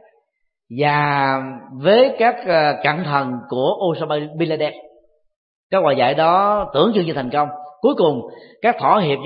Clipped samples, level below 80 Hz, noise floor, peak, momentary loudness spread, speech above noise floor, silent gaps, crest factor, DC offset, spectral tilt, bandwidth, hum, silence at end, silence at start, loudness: under 0.1%; -56 dBFS; -71 dBFS; 0 dBFS; 9 LU; 54 dB; 5.36-5.70 s; 18 dB; under 0.1%; -11 dB/octave; 5.2 kHz; none; 0 s; 0.7 s; -18 LUFS